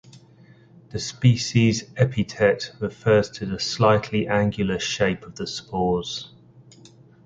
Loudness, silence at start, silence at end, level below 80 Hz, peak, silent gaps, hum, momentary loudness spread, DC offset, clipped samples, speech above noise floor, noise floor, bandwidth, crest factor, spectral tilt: -23 LUFS; 0.15 s; 1 s; -50 dBFS; -4 dBFS; none; none; 12 LU; under 0.1%; under 0.1%; 29 dB; -51 dBFS; 7.8 kHz; 20 dB; -5.5 dB/octave